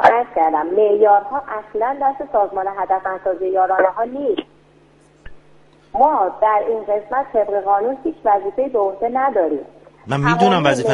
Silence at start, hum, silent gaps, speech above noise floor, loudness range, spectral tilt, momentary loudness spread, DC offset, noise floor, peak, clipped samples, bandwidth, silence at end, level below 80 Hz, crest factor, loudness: 0 s; none; none; 34 dB; 3 LU; -6 dB/octave; 8 LU; under 0.1%; -51 dBFS; 0 dBFS; under 0.1%; 11.5 kHz; 0 s; -52 dBFS; 18 dB; -18 LUFS